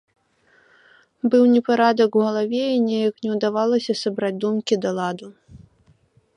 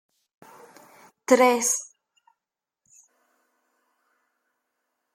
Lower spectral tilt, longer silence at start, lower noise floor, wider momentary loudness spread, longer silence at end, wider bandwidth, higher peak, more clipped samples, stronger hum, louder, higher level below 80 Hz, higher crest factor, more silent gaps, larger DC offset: first, -6 dB/octave vs -1.5 dB/octave; about the same, 1.25 s vs 1.3 s; second, -59 dBFS vs -88 dBFS; second, 8 LU vs 21 LU; second, 0.8 s vs 3.3 s; second, 10.5 kHz vs 15.5 kHz; about the same, -4 dBFS vs -4 dBFS; neither; neither; about the same, -20 LUFS vs -21 LUFS; first, -66 dBFS vs -78 dBFS; second, 18 dB vs 24 dB; neither; neither